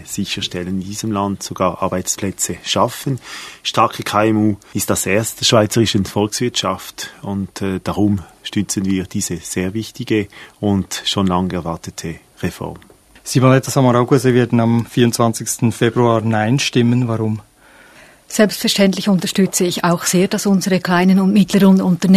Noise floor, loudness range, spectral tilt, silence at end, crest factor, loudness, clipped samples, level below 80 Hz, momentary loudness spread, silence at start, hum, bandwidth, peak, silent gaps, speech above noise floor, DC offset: -46 dBFS; 6 LU; -5 dB/octave; 0 s; 16 dB; -17 LUFS; under 0.1%; -52 dBFS; 12 LU; 0 s; none; 14 kHz; 0 dBFS; none; 29 dB; under 0.1%